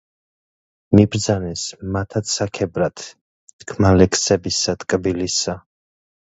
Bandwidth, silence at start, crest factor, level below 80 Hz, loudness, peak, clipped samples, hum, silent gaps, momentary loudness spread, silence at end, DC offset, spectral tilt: 8.2 kHz; 0.9 s; 20 dB; -38 dBFS; -19 LUFS; 0 dBFS; under 0.1%; none; 3.21-3.47 s, 3.53-3.59 s; 14 LU; 0.75 s; under 0.1%; -4.5 dB/octave